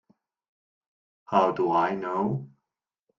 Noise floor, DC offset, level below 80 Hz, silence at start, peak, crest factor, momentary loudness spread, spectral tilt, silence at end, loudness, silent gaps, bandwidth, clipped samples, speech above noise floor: -87 dBFS; under 0.1%; -70 dBFS; 1.3 s; -8 dBFS; 22 dB; 6 LU; -8 dB/octave; 0.7 s; -26 LUFS; none; 7.4 kHz; under 0.1%; 62 dB